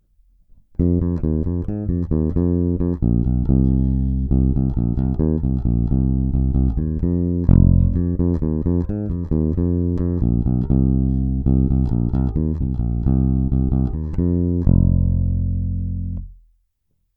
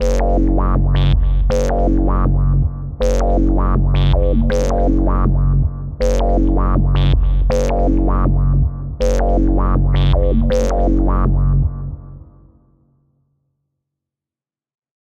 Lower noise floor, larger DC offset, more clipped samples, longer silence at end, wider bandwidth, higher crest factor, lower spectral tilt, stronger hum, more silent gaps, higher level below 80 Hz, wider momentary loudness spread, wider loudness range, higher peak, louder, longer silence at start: second, -68 dBFS vs under -90 dBFS; neither; neither; second, 0.8 s vs 2.8 s; second, 2 kHz vs 7.4 kHz; first, 18 dB vs 12 dB; first, -14 dB/octave vs -8 dB/octave; neither; neither; second, -24 dBFS vs -16 dBFS; about the same, 6 LU vs 4 LU; about the same, 2 LU vs 4 LU; about the same, 0 dBFS vs -2 dBFS; second, -20 LUFS vs -17 LUFS; first, 0.8 s vs 0 s